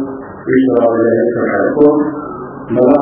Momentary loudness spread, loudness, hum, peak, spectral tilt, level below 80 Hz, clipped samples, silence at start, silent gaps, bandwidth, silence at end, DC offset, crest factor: 14 LU; -12 LUFS; none; 0 dBFS; -12 dB/octave; -48 dBFS; under 0.1%; 0 s; none; 3.4 kHz; 0 s; under 0.1%; 12 dB